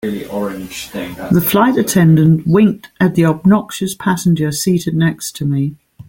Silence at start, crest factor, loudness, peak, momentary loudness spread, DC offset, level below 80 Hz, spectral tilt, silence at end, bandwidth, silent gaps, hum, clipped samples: 0.05 s; 12 dB; -14 LUFS; -2 dBFS; 12 LU; under 0.1%; -46 dBFS; -6 dB/octave; 0.05 s; 17 kHz; none; none; under 0.1%